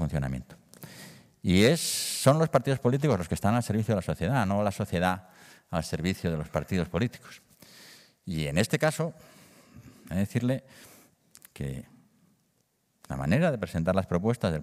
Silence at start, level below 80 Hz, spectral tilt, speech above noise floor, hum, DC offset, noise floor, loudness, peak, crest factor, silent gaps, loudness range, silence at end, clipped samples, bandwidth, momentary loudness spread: 0 s; -52 dBFS; -5.5 dB/octave; 45 dB; none; under 0.1%; -72 dBFS; -28 LUFS; -6 dBFS; 22 dB; none; 10 LU; 0 s; under 0.1%; 16 kHz; 16 LU